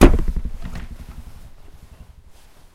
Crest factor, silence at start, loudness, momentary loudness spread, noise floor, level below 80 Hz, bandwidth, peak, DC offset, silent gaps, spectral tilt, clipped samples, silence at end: 20 dB; 0 s; -24 LUFS; 23 LU; -45 dBFS; -22 dBFS; 14 kHz; 0 dBFS; under 0.1%; none; -6.5 dB/octave; under 0.1%; 1.25 s